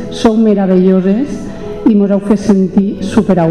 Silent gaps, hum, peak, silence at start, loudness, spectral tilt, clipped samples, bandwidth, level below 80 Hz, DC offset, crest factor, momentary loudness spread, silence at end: none; none; 0 dBFS; 0 s; -11 LUFS; -8 dB/octave; under 0.1%; 10 kHz; -38 dBFS; 1%; 10 dB; 6 LU; 0 s